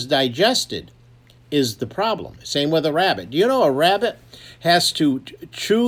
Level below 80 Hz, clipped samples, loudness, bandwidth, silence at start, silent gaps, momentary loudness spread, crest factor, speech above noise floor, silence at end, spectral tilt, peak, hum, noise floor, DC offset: -56 dBFS; under 0.1%; -19 LUFS; 19.5 kHz; 0 s; none; 12 LU; 18 dB; 30 dB; 0 s; -4 dB/octave; -2 dBFS; none; -50 dBFS; under 0.1%